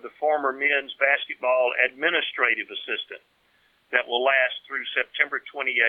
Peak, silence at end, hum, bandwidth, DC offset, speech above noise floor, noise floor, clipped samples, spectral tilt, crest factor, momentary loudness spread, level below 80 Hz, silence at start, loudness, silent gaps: -4 dBFS; 0 s; none; 4.5 kHz; under 0.1%; 40 dB; -64 dBFS; under 0.1%; -4 dB/octave; 22 dB; 9 LU; -80 dBFS; 0.05 s; -23 LUFS; none